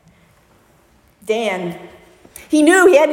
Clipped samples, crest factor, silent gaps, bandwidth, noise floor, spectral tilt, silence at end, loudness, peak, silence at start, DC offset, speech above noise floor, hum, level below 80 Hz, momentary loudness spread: under 0.1%; 16 dB; none; 16.5 kHz; -53 dBFS; -4 dB/octave; 0 s; -14 LUFS; 0 dBFS; 1.3 s; under 0.1%; 40 dB; none; -58 dBFS; 23 LU